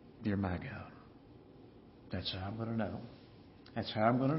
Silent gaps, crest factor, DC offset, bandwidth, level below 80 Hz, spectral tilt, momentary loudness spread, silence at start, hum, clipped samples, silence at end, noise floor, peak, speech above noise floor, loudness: none; 22 dB; under 0.1%; 5.6 kHz; -64 dBFS; -5.5 dB/octave; 25 LU; 0 s; none; under 0.1%; 0 s; -57 dBFS; -16 dBFS; 22 dB; -38 LUFS